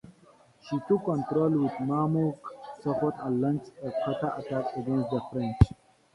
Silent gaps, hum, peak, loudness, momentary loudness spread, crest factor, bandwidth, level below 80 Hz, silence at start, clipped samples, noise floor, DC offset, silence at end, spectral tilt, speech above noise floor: none; none; -4 dBFS; -29 LUFS; 9 LU; 24 dB; 11 kHz; -42 dBFS; 0.05 s; under 0.1%; -59 dBFS; under 0.1%; 0.4 s; -9.5 dB/octave; 31 dB